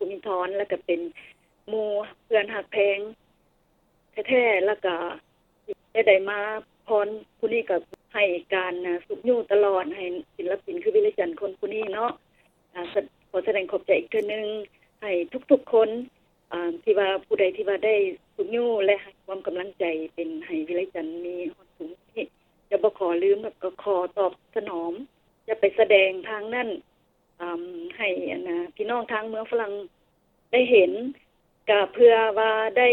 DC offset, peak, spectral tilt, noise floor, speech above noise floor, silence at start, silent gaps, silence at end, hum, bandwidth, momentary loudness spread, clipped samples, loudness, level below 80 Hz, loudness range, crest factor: under 0.1%; -4 dBFS; -6.5 dB/octave; -66 dBFS; 42 dB; 0 s; none; 0 s; none; 4.1 kHz; 15 LU; under 0.1%; -25 LUFS; -70 dBFS; 5 LU; 22 dB